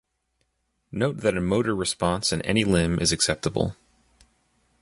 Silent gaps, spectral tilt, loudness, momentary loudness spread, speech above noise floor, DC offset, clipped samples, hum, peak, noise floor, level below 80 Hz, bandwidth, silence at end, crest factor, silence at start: none; -4 dB/octave; -24 LUFS; 6 LU; 50 dB; under 0.1%; under 0.1%; none; -6 dBFS; -74 dBFS; -44 dBFS; 11.5 kHz; 1.1 s; 20 dB; 0.9 s